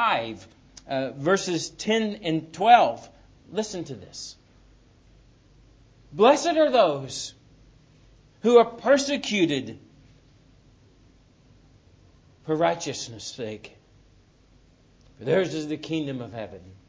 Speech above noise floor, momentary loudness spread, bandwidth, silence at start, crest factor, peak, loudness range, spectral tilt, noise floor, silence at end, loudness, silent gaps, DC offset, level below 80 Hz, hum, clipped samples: 34 dB; 19 LU; 8 kHz; 0 s; 24 dB; -2 dBFS; 9 LU; -4.5 dB/octave; -57 dBFS; 0.15 s; -24 LUFS; none; under 0.1%; -60 dBFS; none; under 0.1%